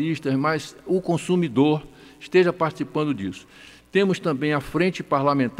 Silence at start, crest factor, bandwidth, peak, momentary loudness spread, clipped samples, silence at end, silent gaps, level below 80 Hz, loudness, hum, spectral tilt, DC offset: 0 s; 16 dB; 14 kHz; -8 dBFS; 8 LU; under 0.1%; 0 s; none; -54 dBFS; -23 LUFS; none; -6.5 dB/octave; under 0.1%